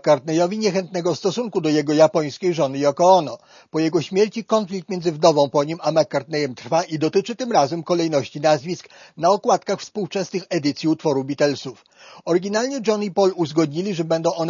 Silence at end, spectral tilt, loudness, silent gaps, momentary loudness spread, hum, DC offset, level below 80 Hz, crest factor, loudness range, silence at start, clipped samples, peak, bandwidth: 0 s; -5.5 dB/octave; -20 LUFS; none; 9 LU; none; under 0.1%; -68 dBFS; 18 dB; 3 LU; 0.05 s; under 0.1%; -2 dBFS; 7.4 kHz